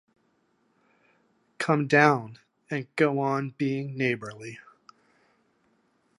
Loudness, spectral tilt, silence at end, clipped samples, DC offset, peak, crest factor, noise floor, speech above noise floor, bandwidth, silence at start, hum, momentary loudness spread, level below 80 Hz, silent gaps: -26 LUFS; -6.5 dB/octave; 1.6 s; under 0.1%; under 0.1%; -4 dBFS; 26 dB; -70 dBFS; 44 dB; 11.5 kHz; 1.6 s; none; 22 LU; -76 dBFS; none